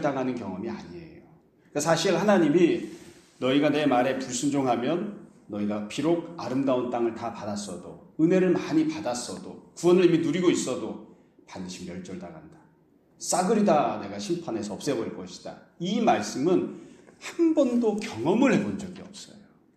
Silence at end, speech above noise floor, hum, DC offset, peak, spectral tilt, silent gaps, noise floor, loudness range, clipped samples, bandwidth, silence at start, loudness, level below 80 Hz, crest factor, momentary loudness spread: 0.4 s; 35 dB; none; under 0.1%; -8 dBFS; -5.5 dB/octave; none; -61 dBFS; 4 LU; under 0.1%; 13.5 kHz; 0 s; -26 LUFS; -68 dBFS; 18 dB; 19 LU